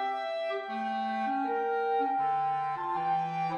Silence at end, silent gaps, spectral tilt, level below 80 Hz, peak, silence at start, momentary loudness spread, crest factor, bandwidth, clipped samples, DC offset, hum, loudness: 0 s; none; -6.5 dB/octave; -80 dBFS; -20 dBFS; 0 s; 5 LU; 10 dB; 7 kHz; under 0.1%; under 0.1%; none; -31 LUFS